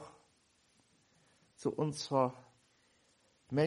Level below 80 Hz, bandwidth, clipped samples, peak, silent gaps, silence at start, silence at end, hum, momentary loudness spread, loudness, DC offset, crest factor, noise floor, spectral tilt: -78 dBFS; 11.5 kHz; under 0.1%; -16 dBFS; none; 0 s; 0 s; none; 20 LU; -36 LUFS; under 0.1%; 22 dB; -72 dBFS; -6 dB/octave